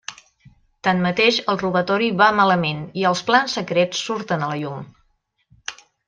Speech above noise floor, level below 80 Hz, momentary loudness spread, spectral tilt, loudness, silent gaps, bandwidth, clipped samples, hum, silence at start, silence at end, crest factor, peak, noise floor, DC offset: 46 dB; -60 dBFS; 18 LU; -4.5 dB/octave; -19 LUFS; none; 9.4 kHz; under 0.1%; none; 0.1 s; 0.35 s; 18 dB; -2 dBFS; -66 dBFS; under 0.1%